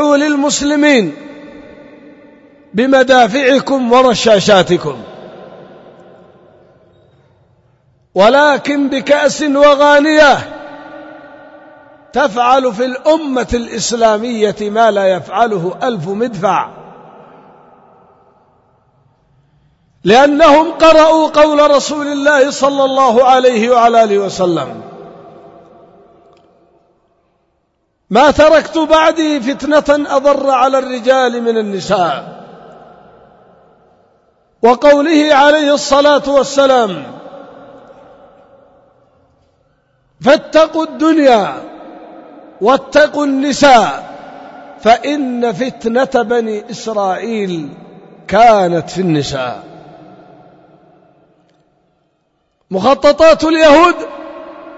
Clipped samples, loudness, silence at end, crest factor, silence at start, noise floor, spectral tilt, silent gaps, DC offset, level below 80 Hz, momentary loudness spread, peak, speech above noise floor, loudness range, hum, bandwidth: under 0.1%; -11 LUFS; 0 s; 12 dB; 0 s; -63 dBFS; -4 dB/octave; none; under 0.1%; -44 dBFS; 15 LU; 0 dBFS; 52 dB; 9 LU; none; 8 kHz